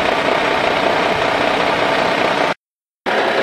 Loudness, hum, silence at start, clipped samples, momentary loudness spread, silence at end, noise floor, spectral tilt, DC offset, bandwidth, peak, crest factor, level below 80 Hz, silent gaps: -16 LUFS; none; 0 s; under 0.1%; 5 LU; 0 s; -76 dBFS; -4 dB/octave; under 0.1%; 14.5 kHz; 0 dBFS; 16 dB; -48 dBFS; 2.58-2.87 s